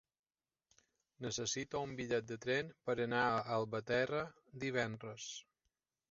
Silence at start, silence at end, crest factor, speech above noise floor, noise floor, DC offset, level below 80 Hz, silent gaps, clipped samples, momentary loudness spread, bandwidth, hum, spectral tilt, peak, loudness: 1.2 s; 0.7 s; 20 dB; 48 dB; -88 dBFS; under 0.1%; -72 dBFS; none; under 0.1%; 12 LU; 7.6 kHz; none; -3.5 dB/octave; -20 dBFS; -39 LUFS